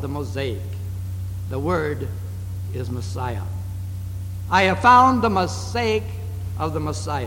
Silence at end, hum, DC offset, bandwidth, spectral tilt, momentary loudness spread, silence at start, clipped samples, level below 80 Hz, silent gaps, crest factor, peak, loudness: 0 s; none; under 0.1%; 17 kHz; -6 dB/octave; 16 LU; 0 s; under 0.1%; -40 dBFS; none; 18 dB; -4 dBFS; -22 LUFS